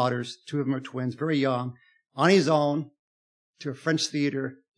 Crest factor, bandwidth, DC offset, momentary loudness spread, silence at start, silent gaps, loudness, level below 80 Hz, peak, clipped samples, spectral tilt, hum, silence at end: 20 dB; 10.5 kHz; under 0.1%; 16 LU; 0 s; 2.99-3.53 s; -26 LUFS; -84 dBFS; -6 dBFS; under 0.1%; -5.5 dB/octave; none; 0.25 s